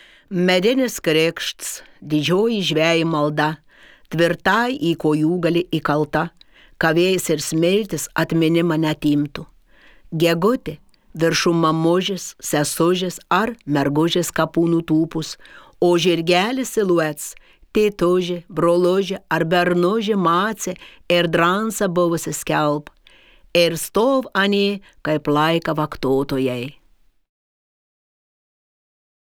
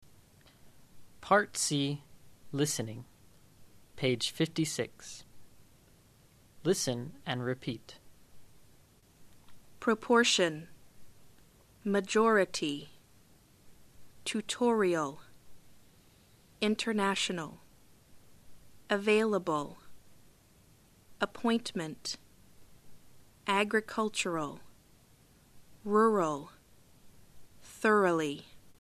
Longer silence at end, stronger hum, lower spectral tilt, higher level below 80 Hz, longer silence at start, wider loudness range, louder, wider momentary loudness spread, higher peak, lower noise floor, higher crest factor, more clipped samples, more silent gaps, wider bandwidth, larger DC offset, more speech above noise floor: first, 2.5 s vs 0.1 s; neither; about the same, -5 dB/octave vs -4 dB/octave; first, -50 dBFS vs -68 dBFS; second, 0.3 s vs 0.65 s; second, 2 LU vs 6 LU; first, -19 LUFS vs -31 LUFS; second, 9 LU vs 17 LU; first, -2 dBFS vs -12 dBFS; second, -56 dBFS vs -62 dBFS; about the same, 18 dB vs 22 dB; neither; neither; first, 19.5 kHz vs 14 kHz; neither; first, 37 dB vs 32 dB